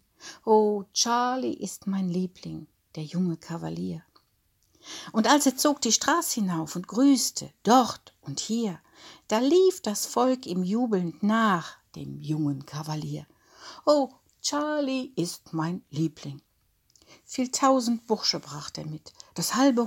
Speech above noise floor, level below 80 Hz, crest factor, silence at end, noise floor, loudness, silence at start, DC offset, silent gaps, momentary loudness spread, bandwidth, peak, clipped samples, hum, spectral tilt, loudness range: 43 dB; -70 dBFS; 20 dB; 0 s; -69 dBFS; -26 LUFS; 0.2 s; under 0.1%; none; 18 LU; 17 kHz; -6 dBFS; under 0.1%; none; -4 dB/octave; 7 LU